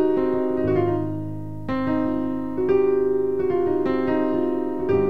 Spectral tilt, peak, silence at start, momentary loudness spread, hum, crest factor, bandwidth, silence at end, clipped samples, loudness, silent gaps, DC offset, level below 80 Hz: -9.5 dB/octave; -10 dBFS; 0 s; 7 LU; none; 12 dB; 4.7 kHz; 0 s; under 0.1%; -23 LUFS; none; 2%; -48 dBFS